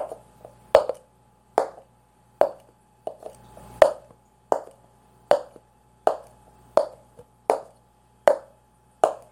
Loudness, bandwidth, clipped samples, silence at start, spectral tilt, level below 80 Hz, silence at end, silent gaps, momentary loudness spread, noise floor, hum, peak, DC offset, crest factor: -25 LUFS; 16 kHz; under 0.1%; 0 s; -4 dB/octave; -60 dBFS; 0.15 s; none; 21 LU; -59 dBFS; none; 0 dBFS; under 0.1%; 26 dB